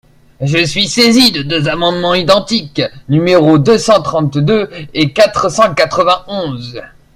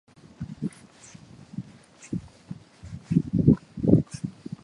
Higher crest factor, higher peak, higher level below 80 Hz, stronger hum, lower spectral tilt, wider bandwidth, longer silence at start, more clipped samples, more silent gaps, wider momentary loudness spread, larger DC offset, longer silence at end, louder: second, 12 dB vs 26 dB; about the same, 0 dBFS vs -2 dBFS; first, -42 dBFS vs -48 dBFS; neither; second, -5 dB/octave vs -9 dB/octave; first, 16 kHz vs 11 kHz; about the same, 0.4 s vs 0.4 s; first, 0.2% vs under 0.1%; neither; second, 11 LU vs 23 LU; neither; first, 0.3 s vs 0.15 s; first, -11 LUFS vs -26 LUFS